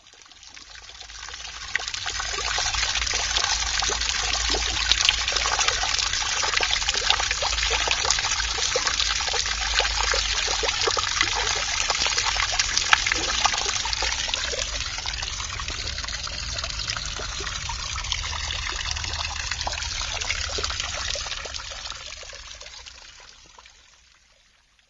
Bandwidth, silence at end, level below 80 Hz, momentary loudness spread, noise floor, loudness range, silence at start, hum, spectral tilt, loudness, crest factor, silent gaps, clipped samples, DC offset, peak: 8 kHz; 1.2 s; -38 dBFS; 13 LU; -60 dBFS; 7 LU; 0.05 s; none; 0 dB/octave; -23 LUFS; 26 dB; none; under 0.1%; under 0.1%; 0 dBFS